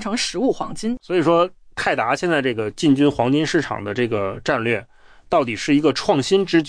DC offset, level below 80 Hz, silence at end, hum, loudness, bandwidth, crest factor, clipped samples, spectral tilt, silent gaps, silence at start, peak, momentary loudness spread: under 0.1%; -48 dBFS; 0 s; none; -20 LUFS; 10.5 kHz; 16 dB; under 0.1%; -5 dB/octave; none; 0 s; -4 dBFS; 7 LU